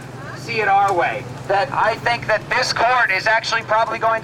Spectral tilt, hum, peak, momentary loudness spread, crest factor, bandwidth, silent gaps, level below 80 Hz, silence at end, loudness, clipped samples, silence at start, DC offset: -3.5 dB/octave; none; -6 dBFS; 7 LU; 12 dB; 16 kHz; none; -52 dBFS; 0 s; -18 LUFS; under 0.1%; 0 s; under 0.1%